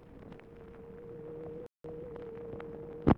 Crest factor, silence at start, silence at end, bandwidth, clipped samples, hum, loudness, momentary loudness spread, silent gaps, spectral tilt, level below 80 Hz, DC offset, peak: 24 dB; 0 s; 0 s; 6.2 kHz; under 0.1%; none; -44 LUFS; 7 LU; none; -10 dB/octave; -52 dBFS; under 0.1%; -12 dBFS